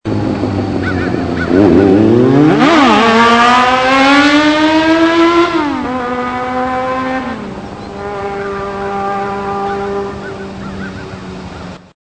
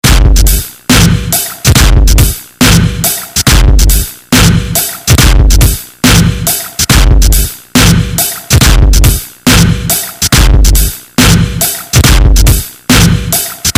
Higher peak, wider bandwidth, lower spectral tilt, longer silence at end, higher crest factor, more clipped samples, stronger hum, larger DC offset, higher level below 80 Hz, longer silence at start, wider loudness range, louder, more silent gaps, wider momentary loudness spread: about the same, 0 dBFS vs 0 dBFS; second, 9 kHz vs over 20 kHz; first, -5.5 dB/octave vs -3.5 dB/octave; first, 0.4 s vs 0.05 s; first, 12 dB vs 6 dB; second, 0.4% vs 3%; neither; first, 0.3% vs under 0.1%; second, -38 dBFS vs -10 dBFS; about the same, 0.05 s vs 0.05 s; first, 12 LU vs 1 LU; second, -11 LUFS vs -8 LUFS; neither; first, 17 LU vs 5 LU